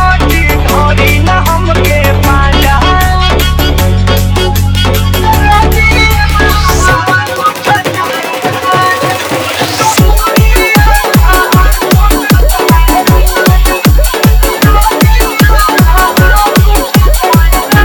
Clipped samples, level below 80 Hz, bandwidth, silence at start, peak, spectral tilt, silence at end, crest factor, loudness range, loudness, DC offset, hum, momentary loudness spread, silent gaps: 0.4%; -10 dBFS; over 20 kHz; 0 s; 0 dBFS; -4.5 dB/octave; 0 s; 6 dB; 2 LU; -8 LUFS; under 0.1%; none; 3 LU; none